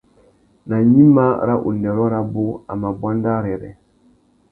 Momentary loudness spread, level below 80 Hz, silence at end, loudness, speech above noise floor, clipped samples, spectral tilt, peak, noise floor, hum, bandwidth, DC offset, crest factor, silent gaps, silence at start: 14 LU; -48 dBFS; 0.8 s; -17 LUFS; 39 dB; under 0.1%; -12.5 dB/octave; 0 dBFS; -55 dBFS; none; 2.8 kHz; under 0.1%; 18 dB; none; 0.65 s